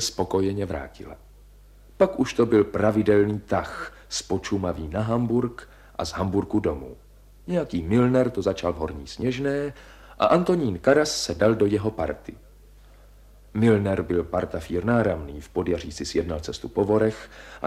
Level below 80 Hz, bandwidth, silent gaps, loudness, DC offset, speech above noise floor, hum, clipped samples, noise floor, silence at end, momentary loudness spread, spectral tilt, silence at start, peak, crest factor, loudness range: -44 dBFS; 15 kHz; none; -24 LUFS; under 0.1%; 26 dB; 50 Hz at -50 dBFS; under 0.1%; -50 dBFS; 0 s; 14 LU; -6 dB/octave; 0 s; -4 dBFS; 20 dB; 4 LU